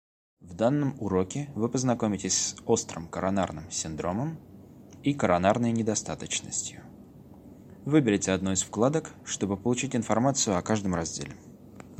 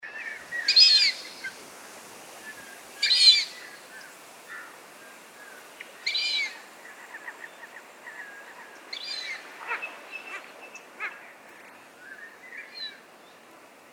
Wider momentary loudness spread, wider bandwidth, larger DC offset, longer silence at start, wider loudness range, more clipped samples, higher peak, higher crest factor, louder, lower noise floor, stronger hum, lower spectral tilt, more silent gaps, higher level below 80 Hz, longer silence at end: second, 11 LU vs 29 LU; second, 15.5 kHz vs 19.5 kHz; neither; first, 0.4 s vs 0.05 s; second, 2 LU vs 18 LU; neither; about the same, -6 dBFS vs -6 dBFS; about the same, 22 dB vs 24 dB; second, -28 LUFS vs -22 LUFS; about the same, -49 dBFS vs -52 dBFS; neither; first, -4.5 dB/octave vs 2 dB/octave; neither; first, -58 dBFS vs -86 dBFS; second, 0 s vs 1 s